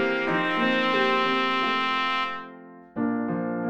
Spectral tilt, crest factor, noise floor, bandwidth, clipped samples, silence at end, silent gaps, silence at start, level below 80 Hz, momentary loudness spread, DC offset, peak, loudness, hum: -5.5 dB/octave; 16 dB; -45 dBFS; 9 kHz; under 0.1%; 0 s; none; 0 s; -64 dBFS; 9 LU; under 0.1%; -10 dBFS; -24 LUFS; none